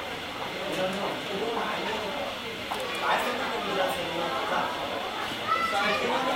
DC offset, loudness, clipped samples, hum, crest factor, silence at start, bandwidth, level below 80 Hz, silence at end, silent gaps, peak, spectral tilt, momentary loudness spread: under 0.1%; -29 LUFS; under 0.1%; none; 16 dB; 0 s; 16 kHz; -60 dBFS; 0 s; none; -14 dBFS; -3 dB/octave; 7 LU